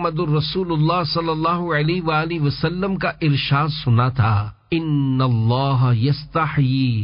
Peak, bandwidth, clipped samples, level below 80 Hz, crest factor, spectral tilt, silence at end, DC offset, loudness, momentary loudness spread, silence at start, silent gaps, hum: -6 dBFS; 5.4 kHz; under 0.1%; -44 dBFS; 12 dB; -11.5 dB/octave; 0 s; under 0.1%; -19 LUFS; 4 LU; 0 s; none; none